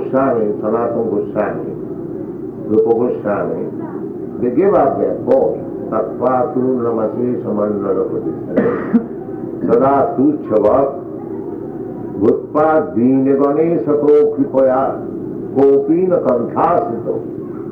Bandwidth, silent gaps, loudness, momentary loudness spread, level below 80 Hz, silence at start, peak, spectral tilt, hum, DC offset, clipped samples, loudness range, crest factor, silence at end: 4.1 kHz; none; -16 LUFS; 13 LU; -50 dBFS; 0 s; -2 dBFS; -11 dB/octave; none; under 0.1%; under 0.1%; 4 LU; 12 dB; 0 s